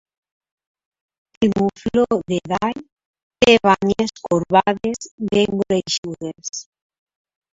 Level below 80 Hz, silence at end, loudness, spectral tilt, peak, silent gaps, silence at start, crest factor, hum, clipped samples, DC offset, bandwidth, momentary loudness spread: -50 dBFS; 0.9 s; -19 LUFS; -4.5 dB/octave; 0 dBFS; 2.92-2.97 s, 3.06-3.14 s, 3.23-3.30 s, 5.11-5.18 s, 5.98-6.03 s; 1.4 s; 20 dB; none; under 0.1%; under 0.1%; 8 kHz; 15 LU